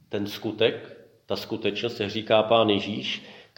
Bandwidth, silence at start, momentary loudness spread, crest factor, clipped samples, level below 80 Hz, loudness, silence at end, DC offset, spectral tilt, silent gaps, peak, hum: 17 kHz; 0.1 s; 12 LU; 20 dB; under 0.1%; -68 dBFS; -25 LUFS; 0.15 s; under 0.1%; -5.5 dB/octave; none; -6 dBFS; none